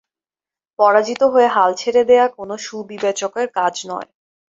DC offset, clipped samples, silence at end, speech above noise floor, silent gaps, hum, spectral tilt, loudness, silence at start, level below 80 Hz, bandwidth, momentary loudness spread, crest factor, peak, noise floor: under 0.1%; under 0.1%; 0.45 s; over 74 dB; none; none; -3 dB/octave; -16 LUFS; 0.8 s; -66 dBFS; 7.8 kHz; 14 LU; 16 dB; -2 dBFS; under -90 dBFS